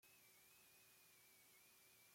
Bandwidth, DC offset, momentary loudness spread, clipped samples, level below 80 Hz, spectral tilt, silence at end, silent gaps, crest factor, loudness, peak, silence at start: 16.5 kHz; under 0.1%; 0 LU; under 0.1%; under -90 dBFS; -0.5 dB/octave; 0 s; none; 14 dB; -68 LUFS; -58 dBFS; 0 s